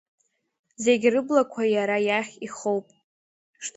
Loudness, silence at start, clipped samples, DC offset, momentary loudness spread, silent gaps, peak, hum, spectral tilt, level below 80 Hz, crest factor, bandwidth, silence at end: -24 LUFS; 0.8 s; under 0.1%; under 0.1%; 10 LU; 3.04-3.53 s; -6 dBFS; none; -4 dB/octave; -74 dBFS; 20 dB; 8.2 kHz; 0.05 s